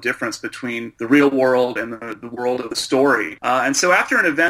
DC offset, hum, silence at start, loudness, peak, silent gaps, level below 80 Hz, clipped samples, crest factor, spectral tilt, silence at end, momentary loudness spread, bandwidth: under 0.1%; none; 0 s; -18 LUFS; -2 dBFS; none; -62 dBFS; under 0.1%; 16 dB; -3 dB/octave; 0 s; 12 LU; 15.5 kHz